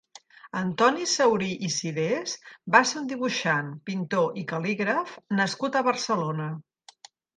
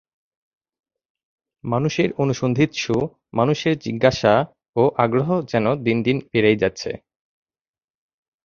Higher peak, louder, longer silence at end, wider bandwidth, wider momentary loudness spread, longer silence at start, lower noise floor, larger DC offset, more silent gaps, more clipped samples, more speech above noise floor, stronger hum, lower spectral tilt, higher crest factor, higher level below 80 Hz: about the same, -2 dBFS vs 0 dBFS; second, -26 LUFS vs -20 LUFS; second, 0.75 s vs 1.45 s; first, 10 kHz vs 7.4 kHz; first, 11 LU vs 8 LU; second, 0.45 s vs 1.65 s; second, -53 dBFS vs under -90 dBFS; neither; second, none vs 4.69-4.73 s; neither; second, 27 dB vs over 70 dB; neither; second, -4 dB/octave vs -6.5 dB/octave; about the same, 24 dB vs 20 dB; second, -72 dBFS vs -52 dBFS